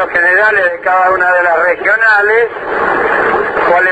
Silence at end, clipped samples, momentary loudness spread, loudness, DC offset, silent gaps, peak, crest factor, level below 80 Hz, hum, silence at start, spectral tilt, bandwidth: 0 s; under 0.1%; 5 LU; -10 LUFS; under 0.1%; none; 0 dBFS; 10 dB; -46 dBFS; none; 0 s; -5 dB/octave; 8.4 kHz